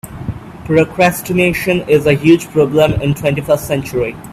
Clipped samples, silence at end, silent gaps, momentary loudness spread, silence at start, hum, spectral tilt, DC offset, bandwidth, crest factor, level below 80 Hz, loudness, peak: under 0.1%; 0 s; none; 9 LU; 0.05 s; none; -6 dB/octave; under 0.1%; 16 kHz; 14 dB; -38 dBFS; -13 LUFS; 0 dBFS